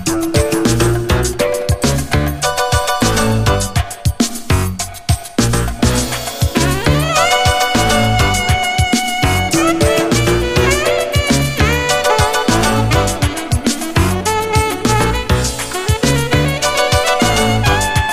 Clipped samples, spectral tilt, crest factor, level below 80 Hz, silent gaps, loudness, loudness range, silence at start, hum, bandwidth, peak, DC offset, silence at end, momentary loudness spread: under 0.1%; -4 dB/octave; 14 dB; -24 dBFS; none; -14 LUFS; 3 LU; 0 s; none; 15.5 kHz; 0 dBFS; under 0.1%; 0 s; 4 LU